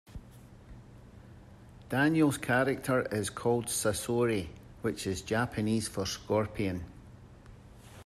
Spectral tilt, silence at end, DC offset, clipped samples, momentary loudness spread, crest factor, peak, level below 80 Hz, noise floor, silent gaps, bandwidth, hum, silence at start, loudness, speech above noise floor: -5 dB/octave; 0.05 s; under 0.1%; under 0.1%; 15 LU; 18 dB; -14 dBFS; -56 dBFS; -53 dBFS; none; 14.5 kHz; none; 0.1 s; -31 LUFS; 22 dB